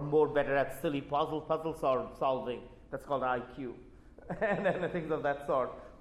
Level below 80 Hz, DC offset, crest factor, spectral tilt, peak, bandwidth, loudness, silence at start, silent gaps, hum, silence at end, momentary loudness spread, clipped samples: -58 dBFS; under 0.1%; 18 dB; -6.5 dB/octave; -16 dBFS; 14 kHz; -33 LUFS; 0 s; none; none; 0.05 s; 14 LU; under 0.1%